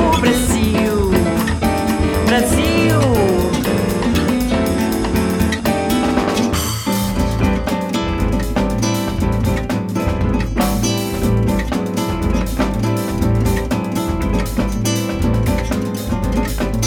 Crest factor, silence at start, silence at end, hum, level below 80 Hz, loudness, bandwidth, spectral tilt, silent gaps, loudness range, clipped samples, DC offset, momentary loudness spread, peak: 14 dB; 0 s; 0 s; none; -24 dBFS; -17 LUFS; over 20 kHz; -5.5 dB/octave; none; 3 LU; under 0.1%; under 0.1%; 5 LU; -2 dBFS